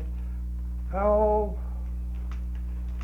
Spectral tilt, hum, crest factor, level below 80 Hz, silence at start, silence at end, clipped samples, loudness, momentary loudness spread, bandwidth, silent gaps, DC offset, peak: -10 dB/octave; 60 Hz at -30 dBFS; 16 dB; -32 dBFS; 0 s; 0 s; under 0.1%; -29 LUFS; 12 LU; 3.1 kHz; none; under 0.1%; -12 dBFS